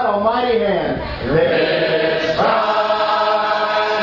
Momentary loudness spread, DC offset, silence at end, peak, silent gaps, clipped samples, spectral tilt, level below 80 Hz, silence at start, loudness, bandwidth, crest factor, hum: 3 LU; under 0.1%; 0 s; -4 dBFS; none; under 0.1%; -6 dB/octave; -40 dBFS; 0 s; -17 LUFS; 6 kHz; 12 dB; none